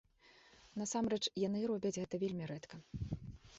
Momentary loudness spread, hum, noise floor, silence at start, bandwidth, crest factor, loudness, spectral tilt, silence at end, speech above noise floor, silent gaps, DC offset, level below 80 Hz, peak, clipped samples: 12 LU; none; -66 dBFS; 0.25 s; 8 kHz; 18 dB; -40 LUFS; -5.5 dB/octave; 0 s; 27 dB; none; under 0.1%; -60 dBFS; -24 dBFS; under 0.1%